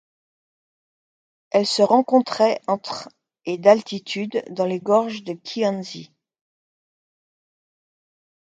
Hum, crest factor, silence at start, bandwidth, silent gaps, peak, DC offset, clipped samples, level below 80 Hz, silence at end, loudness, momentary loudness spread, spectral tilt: none; 22 dB; 1.55 s; 9.4 kHz; none; 0 dBFS; under 0.1%; under 0.1%; -74 dBFS; 2.45 s; -21 LUFS; 15 LU; -5 dB/octave